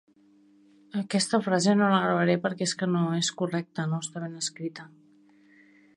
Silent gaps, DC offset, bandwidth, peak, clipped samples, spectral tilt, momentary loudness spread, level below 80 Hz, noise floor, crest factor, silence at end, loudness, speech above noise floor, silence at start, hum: none; under 0.1%; 11 kHz; -10 dBFS; under 0.1%; -4.5 dB/octave; 13 LU; -74 dBFS; -60 dBFS; 18 dB; 1.1 s; -27 LUFS; 33 dB; 0.95 s; none